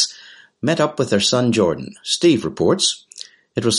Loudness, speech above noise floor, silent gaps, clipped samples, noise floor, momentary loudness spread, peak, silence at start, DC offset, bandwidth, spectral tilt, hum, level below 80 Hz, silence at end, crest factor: -18 LUFS; 27 dB; none; under 0.1%; -44 dBFS; 12 LU; -4 dBFS; 0 s; under 0.1%; 11.5 kHz; -4 dB/octave; none; -56 dBFS; 0 s; 16 dB